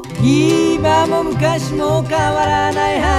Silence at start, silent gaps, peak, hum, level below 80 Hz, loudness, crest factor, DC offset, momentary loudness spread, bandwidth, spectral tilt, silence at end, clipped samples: 0 s; none; 0 dBFS; none; -32 dBFS; -15 LUFS; 14 dB; under 0.1%; 4 LU; 14 kHz; -5.5 dB/octave; 0 s; under 0.1%